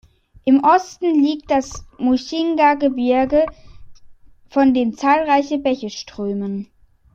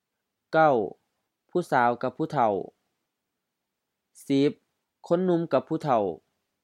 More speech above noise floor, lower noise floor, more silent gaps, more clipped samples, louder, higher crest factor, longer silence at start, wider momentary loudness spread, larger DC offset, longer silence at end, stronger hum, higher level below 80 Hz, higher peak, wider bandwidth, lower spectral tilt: second, 26 dB vs 59 dB; second, -43 dBFS vs -83 dBFS; neither; neither; first, -18 LUFS vs -26 LUFS; about the same, 16 dB vs 20 dB; about the same, 0.45 s vs 0.5 s; about the same, 10 LU vs 10 LU; neither; about the same, 0.5 s vs 0.5 s; neither; first, -48 dBFS vs -76 dBFS; first, -2 dBFS vs -8 dBFS; second, 7.4 kHz vs 14.5 kHz; second, -5.5 dB/octave vs -7 dB/octave